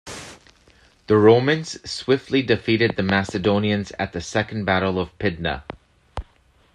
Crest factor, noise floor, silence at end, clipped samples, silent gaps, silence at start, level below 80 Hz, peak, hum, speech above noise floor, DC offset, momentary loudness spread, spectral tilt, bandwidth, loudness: 20 dB; -57 dBFS; 0.55 s; under 0.1%; none; 0.05 s; -46 dBFS; -2 dBFS; none; 37 dB; under 0.1%; 21 LU; -6 dB/octave; 11.5 kHz; -21 LUFS